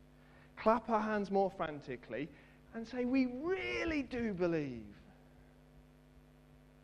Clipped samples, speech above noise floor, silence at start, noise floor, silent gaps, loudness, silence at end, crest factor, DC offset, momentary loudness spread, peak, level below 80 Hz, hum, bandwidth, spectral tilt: under 0.1%; 26 dB; 0.35 s; -62 dBFS; none; -37 LUFS; 0.65 s; 24 dB; under 0.1%; 15 LU; -16 dBFS; -62 dBFS; none; 9.4 kHz; -7 dB/octave